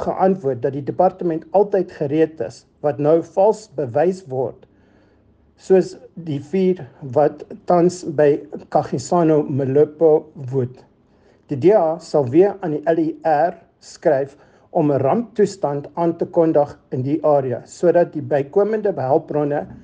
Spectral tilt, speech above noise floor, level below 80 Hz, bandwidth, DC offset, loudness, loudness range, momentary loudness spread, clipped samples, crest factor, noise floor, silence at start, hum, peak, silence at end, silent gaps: -8 dB/octave; 37 dB; -58 dBFS; 9.6 kHz; under 0.1%; -19 LUFS; 3 LU; 9 LU; under 0.1%; 16 dB; -55 dBFS; 0 s; none; -2 dBFS; 0.1 s; none